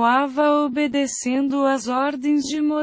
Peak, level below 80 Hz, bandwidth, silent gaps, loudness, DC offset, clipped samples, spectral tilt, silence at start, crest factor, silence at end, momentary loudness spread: -6 dBFS; -62 dBFS; 8 kHz; none; -21 LUFS; under 0.1%; under 0.1%; -3 dB/octave; 0 s; 14 dB; 0 s; 4 LU